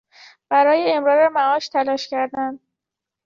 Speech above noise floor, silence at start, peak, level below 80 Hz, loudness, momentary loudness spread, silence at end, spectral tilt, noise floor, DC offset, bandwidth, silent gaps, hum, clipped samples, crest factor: 67 dB; 0.5 s; -4 dBFS; -70 dBFS; -19 LUFS; 8 LU; 0.7 s; -3.5 dB/octave; -85 dBFS; under 0.1%; 7.4 kHz; none; none; under 0.1%; 16 dB